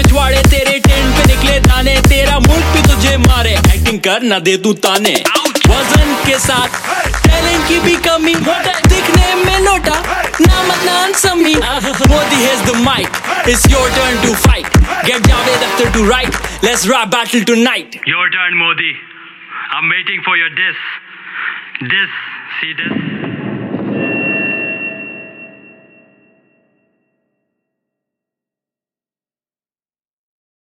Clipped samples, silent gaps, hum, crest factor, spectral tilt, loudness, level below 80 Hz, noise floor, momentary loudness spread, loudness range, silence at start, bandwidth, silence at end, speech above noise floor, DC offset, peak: under 0.1%; none; none; 12 dB; -4 dB/octave; -11 LUFS; -18 dBFS; under -90 dBFS; 11 LU; 9 LU; 0 s; 17 kHz; 5.25 s; over 78 dB; under 0.1%; 0 dBFS